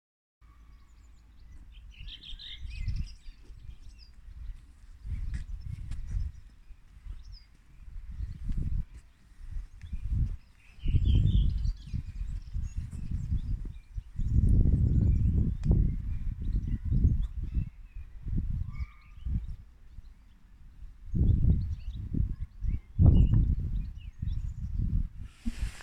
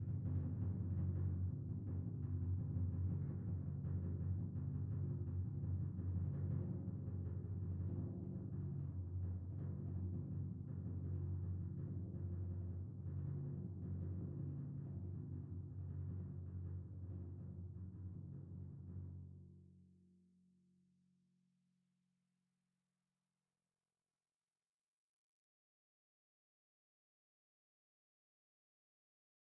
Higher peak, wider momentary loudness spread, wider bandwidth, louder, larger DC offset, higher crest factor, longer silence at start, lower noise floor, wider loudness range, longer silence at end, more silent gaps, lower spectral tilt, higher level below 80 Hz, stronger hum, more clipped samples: first, -8 dBFS vs -32 dBFS; first, 23 LU vs 9 LU; first, 8 kHz vs 1.9 kHz; first, -32 LUFS vs -46 LUFS; neither; first, 22 dB vs 14 dB; first, 0.5 s vs 0 s; second, -54 dBFS vs under -90 dBFS; first, 15 LU vs 10 LU; second, 0 s vs 9.6 s; neither; second, -8.5 dB/octave vs -13.5 dB/octave; first, -32 dBFS vs -64 dBFS; neither; neither